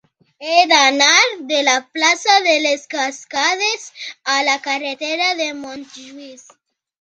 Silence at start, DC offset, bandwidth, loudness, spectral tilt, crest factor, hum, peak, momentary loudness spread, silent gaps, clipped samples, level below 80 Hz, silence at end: 0.4 s; under 0.1%; 10.5 kHz; -15 LUFS; 1 dB/octave; 18 dB; none; 0 dBFS; 20 LU; none; under 0.1%; -72 dBFS; 0.65 s